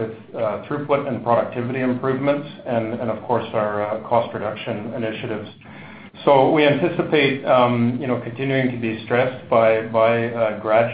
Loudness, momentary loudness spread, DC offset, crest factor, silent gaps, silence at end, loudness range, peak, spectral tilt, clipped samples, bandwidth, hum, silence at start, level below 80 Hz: -20 LUFS; 11 LU; under 0.1%; 20 dB; none; 0 s; 5 LU; 0 dBFS; -11.5 dB/octave; under 0.1%; 5 kHz; none; 0 s; -56 dBFS